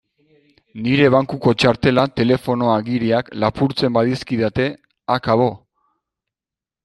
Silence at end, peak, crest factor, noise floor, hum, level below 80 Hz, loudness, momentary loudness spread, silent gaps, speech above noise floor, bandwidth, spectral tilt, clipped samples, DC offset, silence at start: 1.3 s; -2 dBFS; 18 dB; -89 dBFS; none; -48 dBFS; -18 LUFS; 7 LU; none; 72 dB; 12 kHz; -7 dB/octave; under 0.1%; under 0.1%; 0.75 s